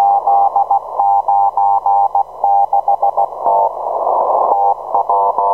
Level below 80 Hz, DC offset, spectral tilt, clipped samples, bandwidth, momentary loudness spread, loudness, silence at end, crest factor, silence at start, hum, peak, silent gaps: -56 dBFS; 0.3%; -7 dB/octave; under 0.1%; 2.1 kHz; 4 LU; -14 LUFS; 0 s; 12 dB; 0 s; 50 Hz at -55 dBFS; -2 dBFS; none